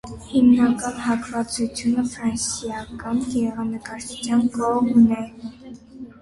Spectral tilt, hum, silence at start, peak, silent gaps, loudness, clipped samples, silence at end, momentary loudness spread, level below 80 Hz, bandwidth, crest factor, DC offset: -4.5 dB/octave; none; 0.05 s; -6 dBFS; none; -21 LUFS; under 0.1%; 0.1 s; 18 LU; -50 dBFS; 11.5 kHz; 16 dB; under 0.1%